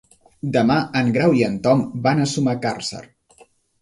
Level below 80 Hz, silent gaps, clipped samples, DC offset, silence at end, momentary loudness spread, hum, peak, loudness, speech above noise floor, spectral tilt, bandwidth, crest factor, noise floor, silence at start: -54 dBFS; none; under 0.1%; under 0.1%; 0.8 s; 11 LU; none; -4 dBFS; -19 LUFS; 35 dB; -6 dB/octave; 11.5 kHz; 16 dB; -53 dBFS; 0.45 s